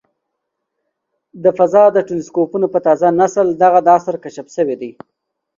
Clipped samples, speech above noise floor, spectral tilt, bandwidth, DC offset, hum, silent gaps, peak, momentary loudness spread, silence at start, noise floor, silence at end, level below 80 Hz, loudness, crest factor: under 0.1%; 62 dB; -7 dB/octave; 7.6 kHz; under 0.1%; none; none; 0 dBFS; 14 LU; 1.35 s; -75 dBFS; 0.65 s; -62 dBFS; -14 LUFS; 16 dB